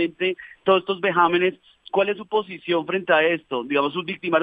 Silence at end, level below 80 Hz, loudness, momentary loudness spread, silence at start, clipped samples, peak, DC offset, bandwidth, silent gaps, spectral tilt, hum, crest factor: 0 s; -70 dBFS; -22 LUFS; 7 LU; 0 s; under 0.1%; -4 dBFS; under 0.1%; 4.9 kHz; none; -7.5 dB/octave; none; 18 dB